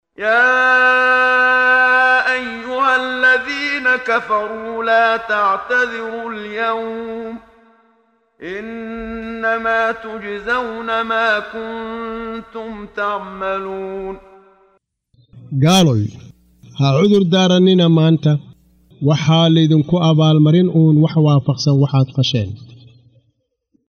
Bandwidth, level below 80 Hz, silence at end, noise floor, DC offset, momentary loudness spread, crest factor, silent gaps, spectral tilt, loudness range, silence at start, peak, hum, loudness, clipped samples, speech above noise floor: 11 kHz; -52 dBFS; 1.15 s; -65 dBFS; under 0.1%; 16 LU; 14 dB; none; -6 dB/octave; 11 LU; 0.2 s; -2 dBFS; none; -15 LUFS; under 0.1%; 50 dB